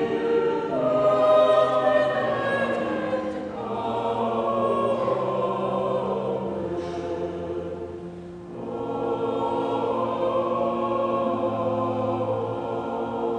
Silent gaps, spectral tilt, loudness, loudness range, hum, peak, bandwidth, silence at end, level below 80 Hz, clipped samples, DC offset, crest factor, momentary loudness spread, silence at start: none; -7 dB/octave; -25 LUFS; 7 LU; none; -8 dBFS; 9.8 kHz; 0 s; -58 dBFS; under 0.1%; under 0.1%; 16 dB; 11 LU; 0 s